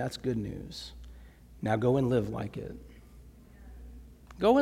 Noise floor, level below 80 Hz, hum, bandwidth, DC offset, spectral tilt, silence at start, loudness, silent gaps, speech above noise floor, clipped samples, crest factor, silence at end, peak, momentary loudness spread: -53 dBFS; -50 dBFS; none; 15.5 kHz; under 0.1%; -7 dB/octave; 0 s; -31 LUFS; none; 22 dB; under 0.1%; 20 dB; 0 s; -12 dBFS; 26 LU